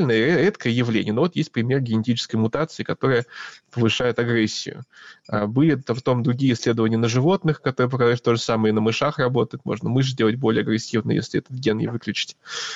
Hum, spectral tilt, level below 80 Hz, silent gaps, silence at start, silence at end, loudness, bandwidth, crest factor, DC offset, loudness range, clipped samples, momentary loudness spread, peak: none; -6 dB/octave; -58 dBFS; none; 0 s; 0 s; -22 LUFS; 8 kHz; 12 dB; under 0.1%; 3 LU; under 0.1%; 7 LU; -8 dBFS